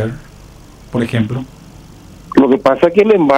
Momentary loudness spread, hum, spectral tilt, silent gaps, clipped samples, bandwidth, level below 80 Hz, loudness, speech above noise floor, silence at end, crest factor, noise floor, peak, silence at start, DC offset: 14 LU; none; -7.5 dB/octave; none; under 0.1%; 12.5 kHz; -42 dBFS; -14 LUFS; 26 dB; 0 s; 14 dB; -38 dBFS; 0 dBFS; 0 s; under 0.1%